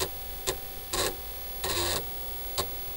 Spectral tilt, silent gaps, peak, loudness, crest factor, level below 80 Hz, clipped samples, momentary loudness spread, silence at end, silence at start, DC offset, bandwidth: -2 dB/octave; none; -12 dBFS; -31 LUFS; 22 dB; -44 dBFS; under 0.1%; 6 LU; 0 s; 0 s; under 0.1%; 17 kHz